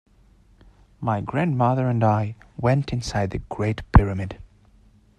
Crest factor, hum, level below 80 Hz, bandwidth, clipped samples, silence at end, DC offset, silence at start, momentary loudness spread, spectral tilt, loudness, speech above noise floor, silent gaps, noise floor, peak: 22 dB; none; -32 dBFS; 9.8 kHz; under 0.1%; 0.75 s; under 0.1%; 1 s; 12 LU; -7.5 dB/octave; -23 LUFS; 34 dB; none; -55 dBFS; 0 dBFS